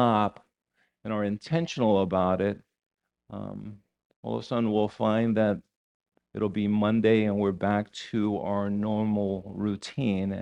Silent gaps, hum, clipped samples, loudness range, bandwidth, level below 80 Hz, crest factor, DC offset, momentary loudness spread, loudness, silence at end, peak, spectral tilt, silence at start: 2.86-2.91 s, 4.05-4.10 s, 4.16-4.23 s, 5.76-6.00 s; none; under 0.1%; 3 LU; 8.8 kHz; -62 dBFS; 18 dB; under 0.1%; 15 LU; -27 LUFS; 0 s; -10 dBFS; -7.5 dB/octave; 0 s